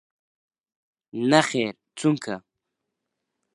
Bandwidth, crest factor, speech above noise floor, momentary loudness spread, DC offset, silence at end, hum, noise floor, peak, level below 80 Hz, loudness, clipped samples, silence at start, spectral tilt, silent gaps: 11.5 kHz; 26 dB; 59 dB; 16 LU; under 0.1%; 1.15 s; none; -82 dBFS; 0 dBFS; -72 dBFS; -23 LUFS; under 0.1%; 1.15 s; -5 dB/octave; none